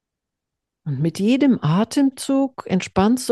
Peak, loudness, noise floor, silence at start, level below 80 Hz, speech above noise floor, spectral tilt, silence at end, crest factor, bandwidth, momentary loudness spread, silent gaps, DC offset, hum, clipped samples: -4 dBFS; -20 LUFS; -83 dBFS; 0.85 s; -54 dBFS; 65 dB; -6 dB/octave; 0 s; 16 dB; 12.5 kHz; 7 LU; none; under 0.1%; none; under 0.1%